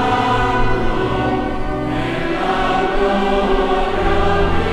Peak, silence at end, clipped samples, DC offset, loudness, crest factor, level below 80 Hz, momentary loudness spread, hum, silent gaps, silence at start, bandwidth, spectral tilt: -2 dBFS; 0 s; under 0.1%; under 0.1%; -18 LUFS; 14 dB; -24 dBFS; 4 LU; none; none; 0 s; 10 kHz; -6.5 dB/octave